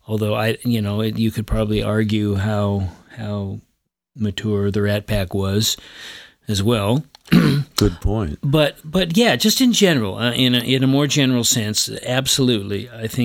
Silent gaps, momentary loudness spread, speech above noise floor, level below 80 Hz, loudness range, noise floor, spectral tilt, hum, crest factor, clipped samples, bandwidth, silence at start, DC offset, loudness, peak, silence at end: none; 11 LU; 52 dB; -36 dBFS; 6 LU; -70 dBFS; -4.5 dB/octave; none; 18 dB; under 0.1%; 17.5 kHz; 0.1 s; under 0.1%; -19 LUFS; -2 dBFS; 0 s